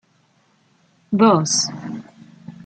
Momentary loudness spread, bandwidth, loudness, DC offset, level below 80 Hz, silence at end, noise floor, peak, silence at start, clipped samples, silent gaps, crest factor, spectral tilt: 18 LU; 9.2 kHz; -17 LUFS; under 0.1%; -66 dBFS; 0.15 s; -60 dBFS; -2 dBFS; 1.1 s; under 0.1%; none; 20 dB; -4 dB/octave